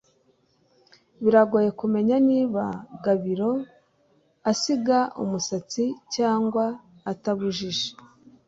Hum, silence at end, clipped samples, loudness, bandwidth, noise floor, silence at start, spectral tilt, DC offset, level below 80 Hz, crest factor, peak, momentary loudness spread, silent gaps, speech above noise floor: none; 0.55 s; under 0.1%; -24 LUFS; 7.8 kHz; -65 dBFS; 1.2 s; -5 dB/octave; under 0.1%; -66 dBFS; 20 dB; -4 dBFS; 10 LU; none; 41 dB